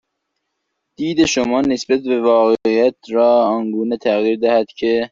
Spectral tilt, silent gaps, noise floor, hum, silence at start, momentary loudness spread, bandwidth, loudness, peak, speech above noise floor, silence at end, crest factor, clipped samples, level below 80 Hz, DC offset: -4.5 dB/octave; none; -74 dBFS; none; 1 s; 6 LU; 7.8 kHz; -16 LUFS; -2 dBFS; 59 dB; 0.05 s; 14 dB; under 0.1%; -54 dBFS; under 0.1%